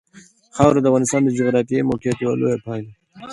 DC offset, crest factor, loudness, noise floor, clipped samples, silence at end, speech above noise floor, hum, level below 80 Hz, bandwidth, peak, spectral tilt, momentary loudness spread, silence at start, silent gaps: under 0.1%; 18 dB; -18 LUFS; -48 dBFS; under 0.1%; 0 s; 31 dB; none; -48 dBFS; 11.5 kHz; 0 dBFS; -6.5 dB/octave; 15 LU; 0.55 s; none